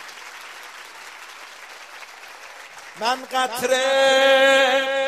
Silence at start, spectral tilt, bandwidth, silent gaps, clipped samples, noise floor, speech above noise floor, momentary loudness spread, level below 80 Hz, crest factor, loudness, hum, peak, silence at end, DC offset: 0 s; -0.5 dB/octave; 15.5 kHz; none; under 0.1%; -41 dBFS; 23 dB; 24 LU; -72 dBFS; 18 dB; -18 LUFS; none; -4 dBFS; 0 s; under 0.1%